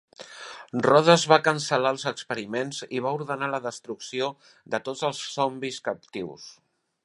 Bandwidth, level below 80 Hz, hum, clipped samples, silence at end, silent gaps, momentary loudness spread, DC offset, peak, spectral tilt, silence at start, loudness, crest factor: 11.5 kHz; -72 dBFS; none; under 0.1%; 0.5 s; none; 20 LU; under 0.1%; -2 dBFS; -4 dB/octave; 0.2 s; -25 LUFS; 24 dB